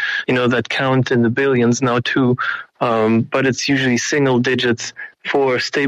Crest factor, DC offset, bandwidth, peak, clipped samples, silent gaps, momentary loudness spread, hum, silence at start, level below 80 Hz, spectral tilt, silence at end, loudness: 12 dB; under 0.1%; 10 kHz; -6 dBFS; under 0.1%; none; 5 LU; none; 0 s; -58 dBFS; -5 dB/octave; 0 s; -17 LUFS